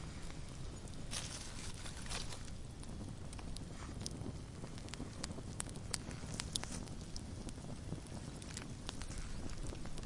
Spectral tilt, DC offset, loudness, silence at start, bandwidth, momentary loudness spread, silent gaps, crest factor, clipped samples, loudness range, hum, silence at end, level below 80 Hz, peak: -4 dB/octave; under 0.1%; -47 LUFS; 0 s; 11.5 kHz; 7 LU; none; 32 dB; under 0.1%; 3 LU; none; 0 s; -50 dBFS; -12 dBFS